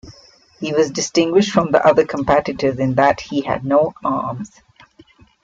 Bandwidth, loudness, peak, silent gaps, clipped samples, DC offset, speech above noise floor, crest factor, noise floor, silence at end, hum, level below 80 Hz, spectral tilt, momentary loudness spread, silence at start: 7.8 kHz; -17 LUFS; -2 dBFS; none; under 0.1%; under 0.1%; 33 dB; 16 dB; -49 dBFS; 0.95 s; none; -50 dBFS; -5 dB/octave; 9 LU; 0.05 s